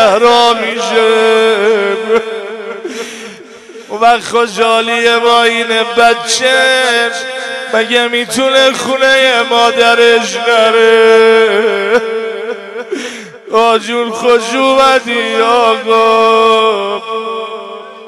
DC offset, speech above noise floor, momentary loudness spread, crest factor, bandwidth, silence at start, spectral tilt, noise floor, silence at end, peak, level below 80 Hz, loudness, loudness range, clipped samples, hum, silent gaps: under 0.1%; 23 dB; 14 LU; 10 dB; 13 kHz; 0 s; -2 dB/octave; -32 dBFS; 0 s; 0 dBFS; -54 dBFS; -9 LUFS; 5 LU; under 0.1%; none; none